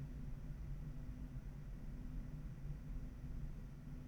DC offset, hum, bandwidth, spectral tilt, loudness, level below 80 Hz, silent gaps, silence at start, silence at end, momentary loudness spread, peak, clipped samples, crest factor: under 0.1%; none; 19.5 kHz; -8 dB/octave; -52 LUFS; -50 dBFS; none; 0 s; 0 s; 2 LU; -36 dBFS; under 0.1%; 12 dB